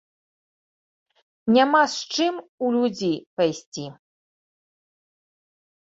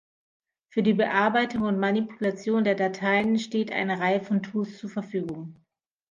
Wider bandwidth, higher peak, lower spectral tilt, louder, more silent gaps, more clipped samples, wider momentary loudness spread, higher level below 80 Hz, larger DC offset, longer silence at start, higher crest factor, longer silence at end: about the same, 8 kHz vs 7.4 kHz; about the same, -4 dBFS vs -6 dBFS; second, -4 dB/octave vs -6.5 dB/octave; first, -22 LUFS vs -26 LUFS; first, 2.49-2.58 s, 3.26-3.37 s, 3.66-3.72 s vs none; neither; first, 16 LU vs 10 LU; about the same, -70 dBFS vs -66 dBFS; neither; first, 1.45 s vs 0.75 s; about the same, 20 dB vs 20 dB; first, 1.9 s vs 0.6 s